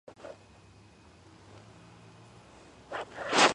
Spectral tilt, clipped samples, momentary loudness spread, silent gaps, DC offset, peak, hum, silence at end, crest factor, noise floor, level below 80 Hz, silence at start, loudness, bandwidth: -2 dB/octave; under 0.1%; 22 LU; none; under 0.1%; -8 dBFS; none; 0 s; 26 dB; -56 dBFS; -66 dBFS; 0.25 s; -30 LUFS; 11 kHz